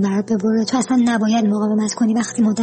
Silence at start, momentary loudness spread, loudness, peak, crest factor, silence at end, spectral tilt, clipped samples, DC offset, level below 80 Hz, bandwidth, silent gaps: 0 s; 2 LU; -18 LUFS; -8 dBFS; 10 dB; 0 s; -5.5 dB/octave; under 0.1%; under 0.1%; -60 dBFS; 8.8 kHz; none